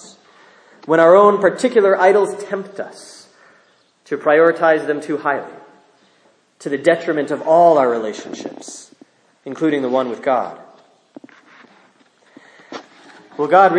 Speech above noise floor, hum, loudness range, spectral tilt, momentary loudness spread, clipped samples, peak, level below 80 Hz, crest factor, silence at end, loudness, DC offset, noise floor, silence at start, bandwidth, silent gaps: 41 dB; none; 8 LU; -5.5 dB/octave; 24 LU; under 0.1%; 0 dBFS; -74 dBFS; 18 dB; 0 s; -15 LUFS; under 0.1%; -56 dBFS; 0.9 s; 10.5 kHz; none